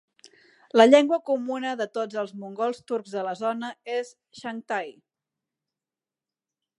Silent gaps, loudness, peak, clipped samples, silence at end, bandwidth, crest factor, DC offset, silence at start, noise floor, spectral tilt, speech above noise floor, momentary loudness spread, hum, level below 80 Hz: none; -25 LUFS; -2 dBFS; under 0.1%; 1.9 s; 11 kHz; 24 dB; under 0.1%; 0.75 s; under -90 dBFS; -4.5 dB/octave; over 66 dB; 19 LU; none; -82 dBFS